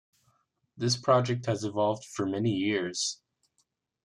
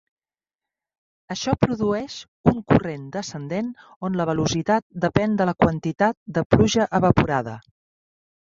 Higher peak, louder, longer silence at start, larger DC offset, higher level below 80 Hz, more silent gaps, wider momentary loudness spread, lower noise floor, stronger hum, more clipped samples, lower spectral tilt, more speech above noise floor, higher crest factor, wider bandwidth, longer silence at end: second, -10 dBFS vs -2 dBFS; second, -29 LUFS vs -22 LUFS; second, 0.75 s vs 1.3 s; neither; second, -72 dBFS vs -44 dBFS; second, none vs 2.28-2.44 s, 3.96-4.01 s, 4.82-4.90 s, 6.17-6.26 s, 6.45-6.50 s; second, 8 LU vs 12 LU; second, -76 dBFS vs under -90 dBFS; neither; neither; second, -4.5 dB/octave vs -6 dB/octave; second, 47 dB vs over 68 dB; about the same, 20 dB vs 22 dB; first, 12 kHz vs 7.6 kHz; about the same, 0.9 s vs 0.85 s